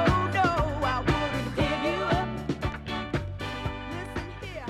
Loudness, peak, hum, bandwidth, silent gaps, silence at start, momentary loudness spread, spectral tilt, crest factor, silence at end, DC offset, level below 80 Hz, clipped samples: -29 LUFS; -10 dBFS; none; 14.5 kHz; none; 0 s; 10 LU; -6 dB/octave; 18 dB; 0 s; under 0.1%; -40 dBFS; under 0.1%